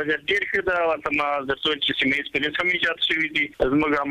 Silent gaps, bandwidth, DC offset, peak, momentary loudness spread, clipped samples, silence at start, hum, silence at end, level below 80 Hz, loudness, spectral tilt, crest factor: none; 14 kHz; under 0.1%; -8 dBFS; 3 LU; under 0.1%; 0 s; none; 0 s; -48 dBFS; -22 LUFS; -4.5 dB/octave; 14 dB